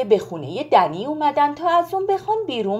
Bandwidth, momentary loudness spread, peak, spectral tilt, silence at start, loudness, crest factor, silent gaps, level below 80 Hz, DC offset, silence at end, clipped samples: 15.5 kHz; 6 LU; -2 dBFS; -6 dB/octave; 0 s; -20 LUFS; 18 dB; none; -62 dBFS; under 0.1%; 0 s; under 0.1%